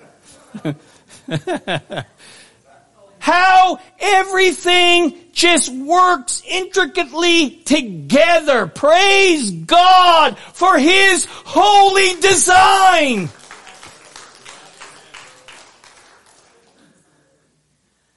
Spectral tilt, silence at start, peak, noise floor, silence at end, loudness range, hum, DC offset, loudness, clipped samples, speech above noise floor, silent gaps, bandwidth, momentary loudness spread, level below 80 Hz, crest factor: -2 dB/octave; 0 s; -2 dBFS; -63 dBFS; 0 s; 7 LU; none; 1%; -12 LUFS; under 0.1%; 50 dB; none; 11.5 kHz; 13 LU; -52 dBFS; 14 dB